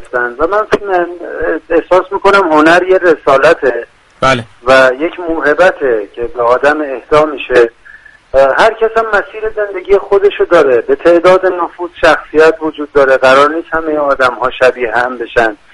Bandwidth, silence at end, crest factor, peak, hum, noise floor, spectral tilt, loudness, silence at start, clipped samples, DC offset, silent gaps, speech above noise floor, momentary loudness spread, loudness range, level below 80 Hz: 11.5 kHz; 0.2 s; 10 dB; 0 dBFS; none; -38 dBFS; -5 dB/octave; -10 LUFS; 0 s; 0.4%; under 0.1%; none; 28 dB; 9 LU; 2 LU; -38 dBFS